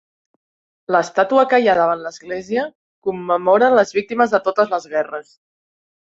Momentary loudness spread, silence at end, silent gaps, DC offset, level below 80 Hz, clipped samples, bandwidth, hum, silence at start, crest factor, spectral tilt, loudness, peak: 13 LU; 0.95 s; 2.75-3.02 s; under 0.1%; -64 dBFS; under 0.1%; 8 kHz; none; 0.9 s; 16 dB; -5 dB/octave; -17 LUFS; -2 dBFS